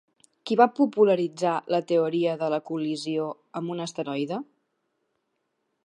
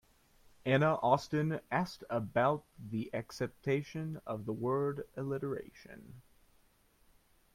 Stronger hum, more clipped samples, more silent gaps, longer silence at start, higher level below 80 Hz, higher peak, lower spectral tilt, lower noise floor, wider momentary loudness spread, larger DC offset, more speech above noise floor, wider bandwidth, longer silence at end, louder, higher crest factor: neither; neither; neither; second, 0.45 s vs 0.65 s; second, -82 dBFS vs -66 dBFS; first, -4 dBFS vs -14 dBFS; about the same, -6 dB/octave vs -7 dB/octave; first, -77 dBFS vs -69 dBFS; about the same, 12 LU vs 12 LU; neither; first, 52 dB vs 34 dB; second, 11 kHz vs 15.5 kHz; about the same, 1.45 s vs 1.35 s; first, -26 LUFS vs -35 LUFS; about the same, 22 dB vs 22 dB